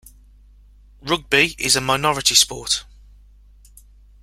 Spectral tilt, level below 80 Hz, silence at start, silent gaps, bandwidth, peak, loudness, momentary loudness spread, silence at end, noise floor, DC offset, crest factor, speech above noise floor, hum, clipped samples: -1.5 dB/octave; -46 dBFS; 1.05 s; none; 16.5 kHz; 0 dBFS; -17 LUFS; 10 LU; 1.4 s; -48 dBFS; under 0.1%; 22 dB; 29 dB; 50 Hz at -45 dBFS; under 0.1%